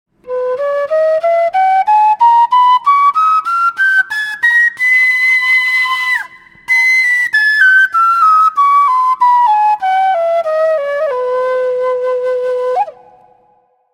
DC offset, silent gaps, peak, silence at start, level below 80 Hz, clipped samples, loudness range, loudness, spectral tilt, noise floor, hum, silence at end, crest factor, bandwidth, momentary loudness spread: under 0.1%; none; 0 dBFS; 0.25 s; -64 dBFS; under 0.1%; 5 LU; -11 LUFS; 0 dB/octave; -54 dBFS; none; 1.05 s; 12 dB; 16.5 kHz; 8 LU